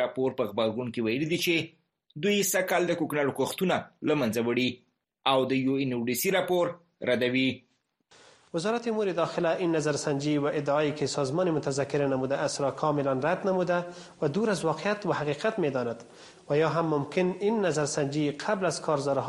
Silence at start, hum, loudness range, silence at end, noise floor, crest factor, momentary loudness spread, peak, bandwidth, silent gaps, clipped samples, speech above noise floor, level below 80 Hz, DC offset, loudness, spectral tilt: 0 s; none; 2 LU; 0 s; -65 dBFS; 18 dB; 5 LU; -8 dBFS; 13 kHz; none; under 0.1%; 37 dB; -68 dBFS; under 0.1%; -28 LUFS; -5 dB/octave